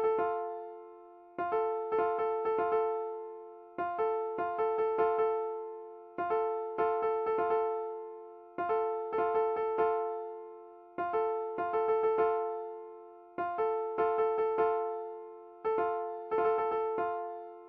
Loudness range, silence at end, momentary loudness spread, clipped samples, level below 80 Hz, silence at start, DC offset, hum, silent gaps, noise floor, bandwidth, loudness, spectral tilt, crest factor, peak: 2 LU; 0 s; 16 LU; under 0.1%; -72 dBFS; 0 s; under 0.1%; none; none; -53 dBFS; 4.6 kHz; -33 LUFS; -4 dB/octave; 14 dB; -18 dBFS